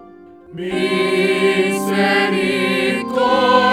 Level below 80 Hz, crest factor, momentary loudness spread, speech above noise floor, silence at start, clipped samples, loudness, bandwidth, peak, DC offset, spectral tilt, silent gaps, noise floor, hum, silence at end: -56 dBFS; 16 dB; 7 LU; 25 dB; 0 s; under 0.1%; -16 LUFS; 16 kHz; 0 dBFS; under 0.1%; -4.5 dB/octave; none; -41 dBFS; none; 0 s